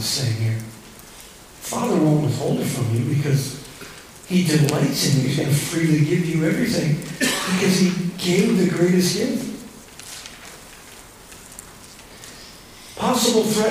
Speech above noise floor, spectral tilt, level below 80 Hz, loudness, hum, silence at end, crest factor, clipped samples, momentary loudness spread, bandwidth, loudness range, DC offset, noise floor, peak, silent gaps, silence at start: 23 dB; -5 dB/octave; -52 dBFS; -20 LUFS; none; 0 s; 20 dB; under 0.1%; 23 LU; 16 kHz; 11 LU; under 0.1%; -43 dBFS; -2 dBFS; none; 0 s